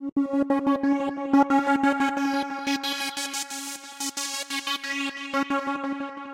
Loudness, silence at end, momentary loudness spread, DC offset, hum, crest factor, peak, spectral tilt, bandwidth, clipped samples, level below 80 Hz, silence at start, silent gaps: -26 LUFS; 0 s; 9 LU; under 0.1%; none; 18 dB; -8 dBFS; -2 dB/octave; 16.5 kHz; under 0.1%; -66 dBFS; 0 s; 0.12-0.16 s